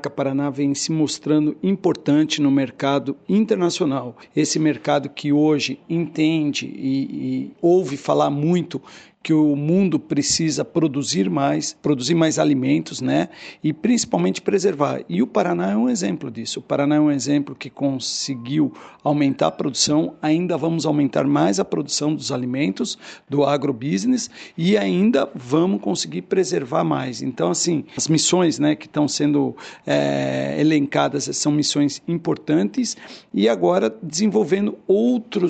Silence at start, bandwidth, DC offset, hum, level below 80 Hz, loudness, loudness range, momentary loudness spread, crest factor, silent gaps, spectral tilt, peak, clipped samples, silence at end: 0.05 s; 9 kHz; under 0.1%; none; -62 dBFS; -20 LUFS; 1 LU; 7 LU; 16 dB; none; -5 dB/octave; -4 dBFS; under 0.1%; 0 s